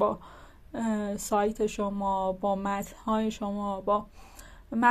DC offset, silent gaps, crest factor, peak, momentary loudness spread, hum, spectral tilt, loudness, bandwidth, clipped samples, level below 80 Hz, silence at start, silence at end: under 0.1%; none; 20 dB; -10 dBFS; 18 LU; none; -5.5 dB/octave; -30 LUFS; 14.5 kHz; under 0.1%; -52 dBFS; 0 s; 0 s